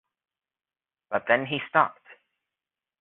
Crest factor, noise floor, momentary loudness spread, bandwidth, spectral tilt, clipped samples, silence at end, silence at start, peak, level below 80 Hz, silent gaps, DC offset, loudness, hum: 24 dB; under -90 dBFS; 7 LU; 4.1 kHz; -2 dB/octave; under 0.1%; 0.9 s; 1.1 s; -6 dBFS; -72 dBFS; none; under 0.1%; -25 LUFS; none